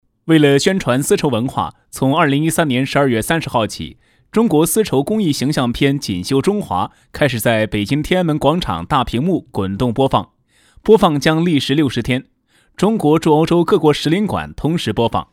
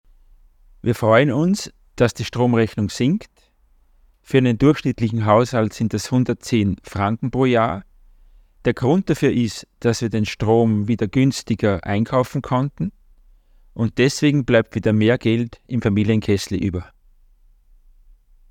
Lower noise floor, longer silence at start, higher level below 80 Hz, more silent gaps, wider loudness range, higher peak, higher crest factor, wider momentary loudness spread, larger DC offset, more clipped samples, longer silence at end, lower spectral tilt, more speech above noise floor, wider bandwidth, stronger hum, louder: second, -51 dBFS vs -57 dBFS; second, 0.25 s vs 0.85 s; first, -40 dBFS vs -46 dBFS; neither; about the same, 2 LU vs 2 LU; about the same, 0 dBFS vs -2 dBFS; about the same, 16 dB vs 18 dB; about the same, 8 LU vs 8 LU; neither; neither; second, 0.1 s vs 1.65 s; about the same, -5.5 dB/octave vs -6.5 dB/octave; about the same, 36 dB vs 38 dB; about the same, 17 kHz vs 15.5 kHz; neither; first, -16 LUFS vs -19 LUFS